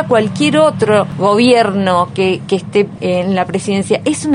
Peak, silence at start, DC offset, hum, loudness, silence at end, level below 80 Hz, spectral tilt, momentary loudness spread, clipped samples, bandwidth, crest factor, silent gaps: 0 dBFS; 0 s; under 0.1%; none; -13 LUFS; 0 s; -52 dBFS; -5.5 dB/octave; 6 LU; under 0.1%; 11 kHz; 12 dB; none